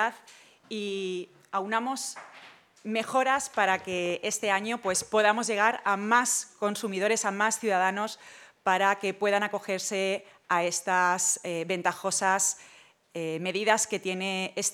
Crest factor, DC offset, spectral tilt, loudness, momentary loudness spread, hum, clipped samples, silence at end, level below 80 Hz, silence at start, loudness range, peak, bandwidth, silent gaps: 22 dB; under 0.1%; -2 dB/octave; -27 LUFS; 11 LU; none; under 0.1%; 0 s; -78 dBFS; 0 s; 4 LU; -8 dBFS; 18.5 kHz; none